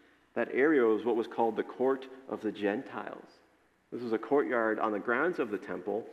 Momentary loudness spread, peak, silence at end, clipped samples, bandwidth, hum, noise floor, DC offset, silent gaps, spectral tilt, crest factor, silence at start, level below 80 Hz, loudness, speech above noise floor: 14 LU; -14 dBFS; 0 s; under 0.1%; 8 kHz; none; -58 dBFS; under 0.1%; none; -7 dB/octave; 18 dB; 0.35 s; -82 dBFS; -31 LUFS; 27 dB